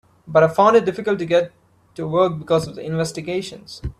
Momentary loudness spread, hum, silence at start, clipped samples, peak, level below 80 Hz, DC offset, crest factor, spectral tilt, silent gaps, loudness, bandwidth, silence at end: 17 LU; none; 0.25 s; under 0.1%; -2 dBFS; -46 dBFS; under 0.1%; 18 dB; -6 dB/octave; none; -19 LUFS; 13.5 kHz; 0.1 s